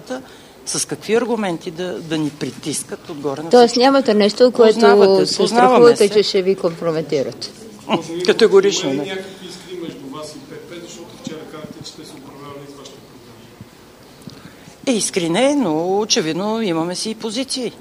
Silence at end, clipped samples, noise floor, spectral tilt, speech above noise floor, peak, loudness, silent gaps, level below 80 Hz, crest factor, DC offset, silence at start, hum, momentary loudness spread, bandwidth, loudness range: 0.05 s; under 0.1%; -43 dBFS; -4 dB/octave; 27 dB; 0 dBFS; -16 LUFS; none; -60 dBFS; 18 dB; under 0.1%; 0.05 s; none; 22 LU; 15.5 kHz; 22 LU